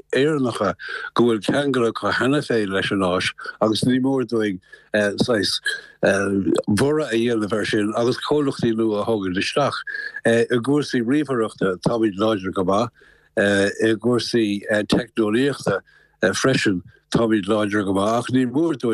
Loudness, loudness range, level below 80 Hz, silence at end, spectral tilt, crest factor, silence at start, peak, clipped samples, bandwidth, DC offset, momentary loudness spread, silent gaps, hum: -21 LUFS; 1 LU; -56 dBFS; 0 s; -5.5 dB/octave; 16 dB; 0.1 s; -6 dBFS; under 0.1%; 12.5 kHz; under 0.1%; 5 LU; none; none